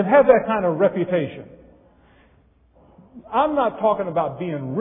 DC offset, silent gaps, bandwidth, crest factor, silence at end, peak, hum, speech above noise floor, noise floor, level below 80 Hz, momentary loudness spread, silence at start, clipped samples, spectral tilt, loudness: under 0.1%; none; 3.8 kHz; 20 dB; 0 s; -2 dBFS; none; 37 dB; -56 dBFS; -56 dBFS; 12 LU; 0 s; under 0.1%; -11 dB/octave; -20 LUFS